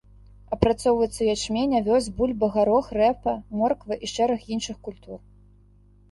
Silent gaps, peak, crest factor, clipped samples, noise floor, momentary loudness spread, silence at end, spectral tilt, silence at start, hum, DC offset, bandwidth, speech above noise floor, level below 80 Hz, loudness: none; -4 dBFS; 22 dB; under 0.1%; -55 dBFS; 14 LU; 0.95 s; -5.5 dB/octave; 0.5 s; 50 Hz at -45 dBFS; under 0.1%; 11.5 kHz; 31 dB; -44 dBFS; -24 LUFS